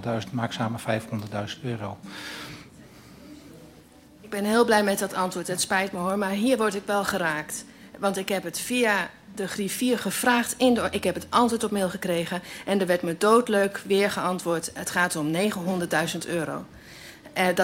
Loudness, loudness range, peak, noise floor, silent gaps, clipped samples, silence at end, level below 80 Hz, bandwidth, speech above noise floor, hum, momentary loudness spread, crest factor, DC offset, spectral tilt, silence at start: -25 LUFS; 8 LU; -6 dBFS; -51 dBFS; none; under 0.1%; 0 s; -60 dBFS; 16.5 kHz; 26 dB; none; 13 LU; 20 dB; under 0.1%; -4 dB/octave; 0 s